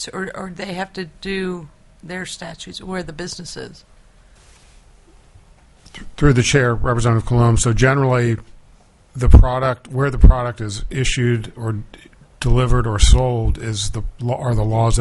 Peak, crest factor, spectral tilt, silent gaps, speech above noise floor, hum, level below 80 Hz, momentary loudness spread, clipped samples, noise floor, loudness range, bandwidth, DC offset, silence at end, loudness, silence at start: 0 dBFS; 18 dB; -5.5 dB/octave; none; 33 dB; none; -22 dBFS; 15 LU; under 0.1%; -49 dBFS; 15 LU; 11.5 kHz; under 0.1%; 0 s; -18 LUFS; 0 s